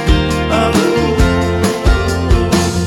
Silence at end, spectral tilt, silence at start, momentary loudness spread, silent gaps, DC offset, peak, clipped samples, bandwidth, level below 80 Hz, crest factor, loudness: 0 s; -5.5 dB/octave; 0 s; 2 LU; none; under 0.1%; 0 dBFS; under 0.1%; 17 kHz; -18 dBFS; 12 dB; -13 LUFS